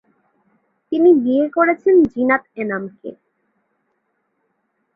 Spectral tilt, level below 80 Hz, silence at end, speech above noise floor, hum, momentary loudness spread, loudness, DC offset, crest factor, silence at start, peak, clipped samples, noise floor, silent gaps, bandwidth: -9 dB/octave; -58 dBFS; 1.8 s; 54 dB; none; 17 LU; -16 LUFS; under 0.1%; 16 dB; 0.9 s; -2 dBFS; under 0.1%; -70 dBFS; none; 3.7 kHz